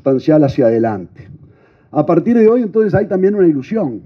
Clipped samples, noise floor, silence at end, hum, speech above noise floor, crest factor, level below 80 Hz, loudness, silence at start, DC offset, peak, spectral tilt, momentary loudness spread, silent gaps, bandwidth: under 0.1%; -46 dBFS; 0.05 s; none; 33 dB; 14 dB; -52 dBFS; -13 LUFS; 0.05 s; under 0.1%; 0 dBFS; -10 dB/octave; 9 LU; none; 6.6 kHz